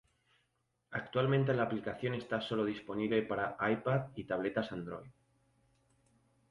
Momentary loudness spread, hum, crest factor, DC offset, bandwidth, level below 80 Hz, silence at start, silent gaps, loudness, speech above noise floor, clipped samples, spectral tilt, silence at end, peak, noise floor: 11 LU; none; 18 dB; under 0.1%; 10.5 kHz; -68 dBFS; 0.9 s; none; -35 LUFS; 45 dB; under 0.1%; -8 dB/octave; 1.4 s; -18 dBFS; -80 dBFS